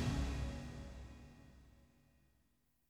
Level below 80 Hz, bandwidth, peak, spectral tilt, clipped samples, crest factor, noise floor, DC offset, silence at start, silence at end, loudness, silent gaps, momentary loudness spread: -50 dBFS; 13 kHz; -28 dBFS; -6 dB/octave; under 0.1%; 18 dB; -79 dBFS; under 0.1%; 0 s; 1.1 s; -45 LUFS; none; 24 LU